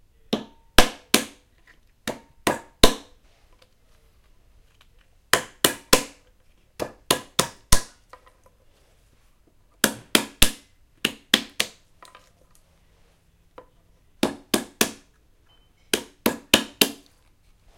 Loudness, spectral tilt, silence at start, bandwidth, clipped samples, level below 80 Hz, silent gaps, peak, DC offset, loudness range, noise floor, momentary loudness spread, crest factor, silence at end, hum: -23 LUFS; -2 dB/octave; 0.3 s; 16.5 kHz; under 0.1%; -38 dBFS; none; 0 dBFS; under 0.1%; 6 LU; -60 dBFS; 15 LU; 26 dB; 0.85 s; none